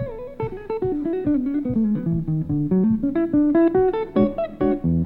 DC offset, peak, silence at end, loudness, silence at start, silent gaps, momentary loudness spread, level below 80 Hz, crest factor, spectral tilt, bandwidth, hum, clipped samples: under 0.1%; -6 dBFS; 0 s; -21 LUFS; 0 s; none; 10 LU; -42 dBFS; 14 dB; -11.5 dB/octave; 4.2 kHz; none; under 0.1%